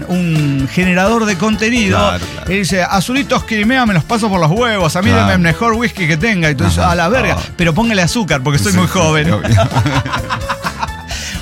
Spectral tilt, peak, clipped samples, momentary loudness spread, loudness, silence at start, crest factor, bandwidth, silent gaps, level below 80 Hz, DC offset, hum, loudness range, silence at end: -5 dB/octave; -2 dBFS; under 0.1%; 7 LU; -13 LUFS; 0 s; 12 dB; 16.5 kHz; none; -30 dBFS; under 0.1%; none; 1 LU; 0 s